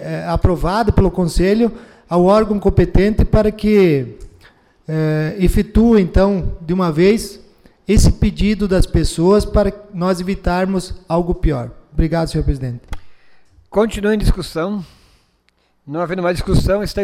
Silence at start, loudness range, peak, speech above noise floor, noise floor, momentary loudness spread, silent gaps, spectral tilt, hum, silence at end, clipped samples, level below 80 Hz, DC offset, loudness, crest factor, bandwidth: 0 s; 6 LU; -4 dBFS; 46 dB; -60 dBFS; 10 LU; none; -7 dB/octave; none; 0 s; under 0.1%; -22 dBFS; under 0.1%; -16 LUFS; 12 dB; 15 kHz